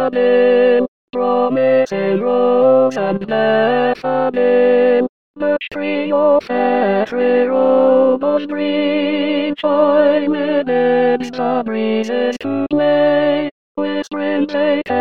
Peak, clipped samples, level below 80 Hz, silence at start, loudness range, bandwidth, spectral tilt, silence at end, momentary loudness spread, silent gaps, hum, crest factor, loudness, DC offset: -2 dBFS; under 0.1%; -60 dBFS; 0 s; 2 LU; 7 kHz; -6.5 dB/octave; 0 s; 8 LU; 0.88-1.08 s, 5.09-5.34 s, 13.51-13.75 s; none; 12 dB; -15 LUFS; 0.7%